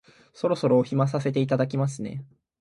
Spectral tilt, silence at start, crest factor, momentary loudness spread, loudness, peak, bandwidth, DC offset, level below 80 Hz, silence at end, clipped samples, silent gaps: -7.5 dB/octave; 0.35 s; 18 dB; 13 LU; -25 LUFS; -8 dBFS; 11.5 kHz; under 0.1%; -64 dBFS; 0.35 s; under 0.1%; none